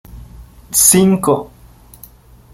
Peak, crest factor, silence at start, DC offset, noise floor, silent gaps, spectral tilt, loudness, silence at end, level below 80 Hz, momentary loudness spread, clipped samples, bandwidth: 0 dBFS; 16 dB; 0.15 s; under 0.1%; -42 dBFS; none; -4 dB/octave; -11 LUFS; 1.05 s; -42 dBFS; 9 LU; under 0.1%; over 20 kHz